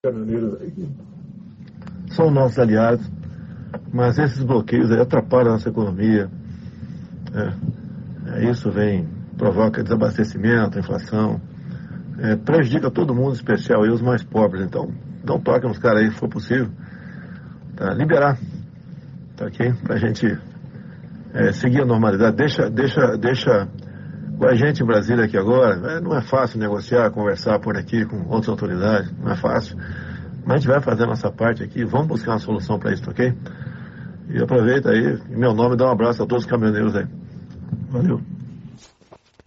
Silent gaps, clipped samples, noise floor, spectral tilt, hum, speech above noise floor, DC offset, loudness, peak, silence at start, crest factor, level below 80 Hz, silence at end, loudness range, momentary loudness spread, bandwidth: none; under 0.1%; -51 dBFS; -7 dB/octave; none; 32 dB; under 0.1%; -19 LUFS; -2 dBFS; 0.05 s; 16 dB; -52 dBFS; 0.7 s; 4 LU; 19 LU; 7.4 kHz